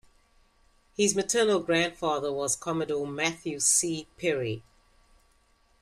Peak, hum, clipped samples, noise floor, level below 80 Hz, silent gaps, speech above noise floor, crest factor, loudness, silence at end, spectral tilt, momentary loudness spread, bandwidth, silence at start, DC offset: -10 dBFS; none; under 0.1%; -65 dBFS; -62 dBFS; none; 37 dB; 20 dB; -27 LUFS; 1.2 s; -2.5 dB/octave; 9 LU; 15 kHz; 1 s; under 0.1%